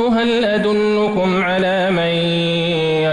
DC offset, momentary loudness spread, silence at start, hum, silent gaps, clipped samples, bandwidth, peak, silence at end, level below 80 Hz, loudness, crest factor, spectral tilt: under 0.1%; 1 LU; 0 s; none; none; under 0.1%; 11 kHz; -8 dBFS; 0 s; -48 dBFS; -16 LUFS; 8 dB; -6.5 dB/octave